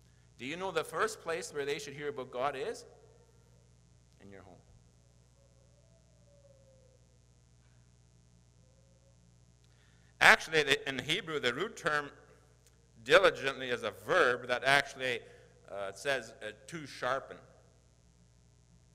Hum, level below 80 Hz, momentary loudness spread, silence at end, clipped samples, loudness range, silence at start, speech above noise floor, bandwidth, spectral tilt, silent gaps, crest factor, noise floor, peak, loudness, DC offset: 60 Hz at -65 dBFS; -66 dBFS; 20 LU; 1.55 s; under 0.1%; 11 LU; 0.4 s; 32 dB; 16 kHz; -3 dB/octave; none; 30 dB; -64 dBFS; -6 dBFS; -31 LUFS; under 0.1%